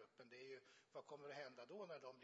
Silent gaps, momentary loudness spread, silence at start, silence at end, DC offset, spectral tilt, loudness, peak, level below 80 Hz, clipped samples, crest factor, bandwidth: none; 6 LU; 0 s; 0 s; under 0.1%; -2.5 dB/octave; -58 LUFS; -42 dBFS; under -90 dBFS; under 0.1%; 16 dB; 7.6 kHz